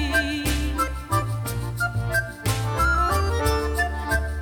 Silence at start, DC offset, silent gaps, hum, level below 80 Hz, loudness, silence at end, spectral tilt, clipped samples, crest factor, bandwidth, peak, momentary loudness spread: 0 s; under 0.1%; none; none; -30 dBFS; -24 LUFS; 0 s; -4.5 dB/octave; under 0.1%; 16 dB; 19 kHz; -8 dBFS; 5 LU